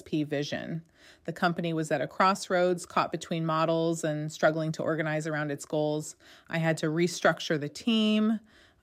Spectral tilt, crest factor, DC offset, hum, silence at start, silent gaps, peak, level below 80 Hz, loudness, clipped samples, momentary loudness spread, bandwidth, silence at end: -5.5 dB/octave; 18 dB; under 0.1%; none; 0.05 s; none; -12 dBFS; -72 dBFS; -29 LUFS; under 0.1%; 9 LU; 15.5 kHz; 0.45 s